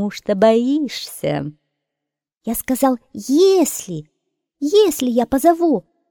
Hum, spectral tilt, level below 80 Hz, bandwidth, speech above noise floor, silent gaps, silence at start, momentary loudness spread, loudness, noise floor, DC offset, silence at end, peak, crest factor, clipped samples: none; -4.5 dB/octave; -52 dBFS; 18 kHz; 66 dB; 2.37-2.41 s; 0 s; 12 LU; -17 LUFS; -83 dBFS; under 0.1%; 0.3 s; -2 dBFS; 16 dB; under 0.1%